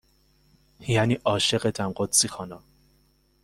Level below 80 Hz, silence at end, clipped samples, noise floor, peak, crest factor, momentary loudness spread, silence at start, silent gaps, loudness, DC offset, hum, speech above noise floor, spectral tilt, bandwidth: -56 dBFS; 0.85 s; under 0.1%; -64 dBFS; -4 dBFS; 22 dB; 17 LU; 0.8 s; none; -24 LUFS; under 0.1%; none; 39 dB; -3.5 dB/octave; 16 kHz